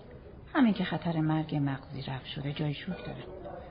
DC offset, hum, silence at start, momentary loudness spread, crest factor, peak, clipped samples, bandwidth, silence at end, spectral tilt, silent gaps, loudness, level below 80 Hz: under 0.1%; none; 0 s; 16 LU; 16 dB; -16 dBFS; under 0.1%; 5.2 kHz; 0 s; -6 dB/octave; none; -32 LUFS; -54 dBFS